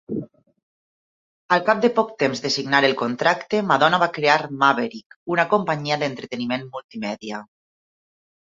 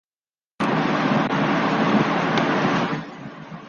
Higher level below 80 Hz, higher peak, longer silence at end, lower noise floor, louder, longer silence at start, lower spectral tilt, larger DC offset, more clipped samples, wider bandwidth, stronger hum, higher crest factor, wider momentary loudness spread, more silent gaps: second, -66 dBFS vs -58 dBFS; first, -2 dBFS vs -6 dBFS; first, 1 s vs 0 s; about the same, under -90 dBFS vs under -90 dBFS; about the same, -21 LUFS vs -21 LUFS; second, 0.1 s vs 0.6 s; second, -4.5 dB/octave vs -6.5 dB/octave; neither; neither; about the same, 7.8 kHz vs 7.2 kHz; neither; about the same, 20 dB vs 16 dB; about the same, 13 LU vs 11 LU; first, 0.63-1.49 s, 5.06-5.10 s, 5.16-5.26 s, 6.84-6.89 s vs none